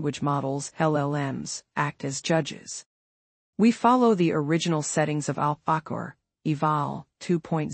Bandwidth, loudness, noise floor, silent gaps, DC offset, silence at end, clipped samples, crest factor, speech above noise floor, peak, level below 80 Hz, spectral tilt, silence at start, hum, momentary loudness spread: 8.8 kHz; -26 LUFS; under -90 dBFS; 2.86-3.53 s; under 0.1%; 0 s; under 0.1%; 18 dB; over 65 dB; -8 dBFS; -66 dBFS; -5.5 dB/octave; 0 s; none; 14 LU